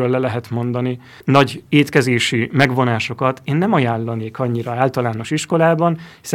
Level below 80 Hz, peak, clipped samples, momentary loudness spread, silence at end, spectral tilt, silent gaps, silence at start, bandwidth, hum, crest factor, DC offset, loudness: -56 dBFS; 0 dBFS; under 0.1%; 8 LU; 0 s; -6 dB/octave; none; 0 s; 16 kHz; none; 18 dB; under 0.1%; -18 LUFS